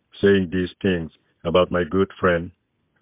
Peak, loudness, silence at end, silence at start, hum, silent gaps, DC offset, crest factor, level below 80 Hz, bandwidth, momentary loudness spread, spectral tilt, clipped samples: -6 dBFS; -21 LUFS; 0.5 s; 0.15 s; none; none; under 0.1%; 16 dB; -42 dBFS; 3.9 kHz; 11 LU; -10.5 dB/octave; under 0.1%